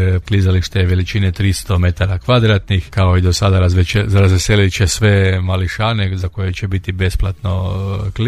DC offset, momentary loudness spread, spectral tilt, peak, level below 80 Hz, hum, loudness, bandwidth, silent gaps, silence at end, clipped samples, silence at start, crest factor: under 0.1%; 8 LU; -5.5 dB/octave; 0 dBFS; -28 dBFS; none; -15 LUFS; 13 kHz; none; 0 s; under 0.1%; 0 s; 12 dB